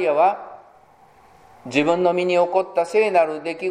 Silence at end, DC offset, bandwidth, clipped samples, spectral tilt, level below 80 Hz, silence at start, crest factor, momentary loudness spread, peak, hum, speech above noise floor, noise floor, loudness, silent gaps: 0 s; under 0.1%; 10.5 kHz; under 0.1%; -5.5 dB/octave; -68 dBFS; 0 s; 18 dB; 12 LU; -2 dBFS; none; 33 dB; -52 dBFS; -20 LUFS; none